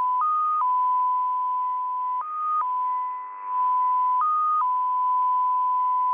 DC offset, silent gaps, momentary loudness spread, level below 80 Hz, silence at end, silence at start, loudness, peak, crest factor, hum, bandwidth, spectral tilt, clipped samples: under 0.1%; none; 6 LU; -80 dBFS; 0 s; 0 s; -24 LUFS; -16 dBFS; 6 dB; none; 3.5 kHz; -4 dB/octave; under 0.1%